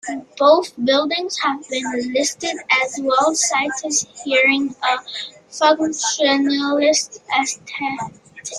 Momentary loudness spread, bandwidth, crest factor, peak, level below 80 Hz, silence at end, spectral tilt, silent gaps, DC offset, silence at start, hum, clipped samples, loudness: 11 LU; 12.5 kHz; 18 dB; -2 dBFS; -66 dBFS; 0 s; -1 dB/octave; none; under 0.1%; 0.05 s; none; under 0.1%; -18 LUFS